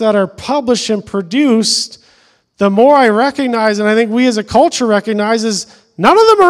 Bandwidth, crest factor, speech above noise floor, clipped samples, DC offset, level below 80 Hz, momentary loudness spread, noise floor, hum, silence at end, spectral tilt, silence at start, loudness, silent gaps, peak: 13.5 kHz; 12 dB; 40 dB; 0.5%; under 0.1%; -50 dBFS; 9 LU; -51 dBFS; none; 0 s; -4 dB/octave; 0 s; -12 LUFS; none; 0 dBFS